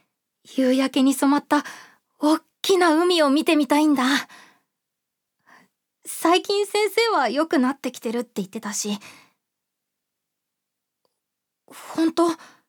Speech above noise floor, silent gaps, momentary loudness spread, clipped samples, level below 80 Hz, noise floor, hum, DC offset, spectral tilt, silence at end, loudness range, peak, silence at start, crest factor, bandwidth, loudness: 62 dB; none; 12 LU; under 0.1%; -84 dBFS; -82 dBFS; 50 Hz at -60 dBFS; under 0.1%; -3 dB/octave; 0.35 s; 13 LU; -4 dBFS; 0.5 s; 18 dB; over 20 kHz; -21 LUFS